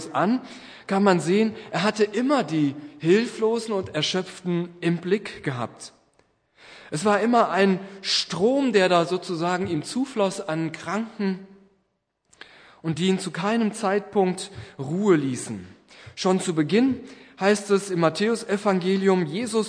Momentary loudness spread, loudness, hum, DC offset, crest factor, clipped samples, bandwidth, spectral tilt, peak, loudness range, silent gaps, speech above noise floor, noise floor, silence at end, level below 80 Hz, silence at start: 11 LU; -24 LUFS; none; under 0.1%; 18 dB; under 0.1%; 10.5 kHz; -5.5 dB/octave; -6 dBFS; 6 LU; none; 50 dB; -73 dBFS; 0 s; -68 dBFS; 0 s